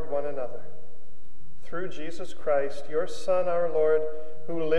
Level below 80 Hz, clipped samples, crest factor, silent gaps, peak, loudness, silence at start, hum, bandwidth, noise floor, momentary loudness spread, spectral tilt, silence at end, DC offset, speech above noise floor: -62 dBFS; under 0.1%; 16 dB; none; -12 dBFS; -29 LUFS; 0 s; none; 11.5 kHz; -56 dBFS; 14 LU; -6 dB/octave; 0 s; 8%; 27 dB